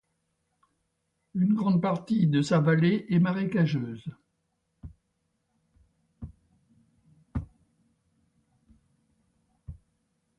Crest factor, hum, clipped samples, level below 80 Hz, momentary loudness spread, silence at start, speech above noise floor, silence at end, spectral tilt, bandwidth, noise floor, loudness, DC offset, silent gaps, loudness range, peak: 18 dB; none; under 0.1%; -54 dBFS; 24 LU; 1.35 s; 53 dB; 0.65 s; -8 dB/octave; 9 kHz; -78 dBFS; -26 LUFS; under 0.1%; none; 21 LU; -12 dBFS